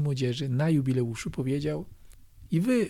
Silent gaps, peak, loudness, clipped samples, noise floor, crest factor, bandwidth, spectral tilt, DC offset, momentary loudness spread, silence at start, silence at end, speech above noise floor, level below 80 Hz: none; -16 dBFS; -29 LUFS; under 0.1%; -49 dBFS; 12 dB; 14.5 kHz; -7 dB/octave; under 0.1%; 8 LU; 0 s; 0 s; 22 dB; -52 dBFS